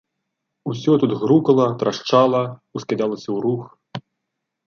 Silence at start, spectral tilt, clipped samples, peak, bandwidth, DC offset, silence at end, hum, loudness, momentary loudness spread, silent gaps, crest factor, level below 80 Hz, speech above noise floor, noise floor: 0.65 s; -7 dB/octave; under 0.1%; -2 dBFS; 7 kHz; under 0.1%; 0.7 s; none; -19 LUFS; 18 LU; none; 18 dB; -66 dBFS; 61 dB; -79 dBFS